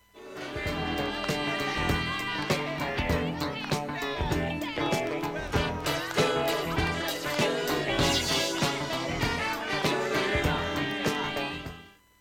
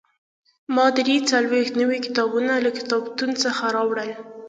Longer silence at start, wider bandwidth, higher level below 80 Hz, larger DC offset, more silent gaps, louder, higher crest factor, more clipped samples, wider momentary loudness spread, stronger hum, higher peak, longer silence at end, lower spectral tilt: second, 0.15 s vs 0.7 s; first, 17.5 kHz vs 9.2 kHz; first, -44 dBFS vs -72 dBFS; neither; neither; second, -29 LUFS vs -21 LUFS; about the same, 18 dB vs 18 dB; neither; about the same, 7 LU vs 6 LU; neither; second, -10 dBFS vs -4 dBFS; first, 0.3 s vs 0 s; first, -4 dB/octave vs -2.5 dB/octave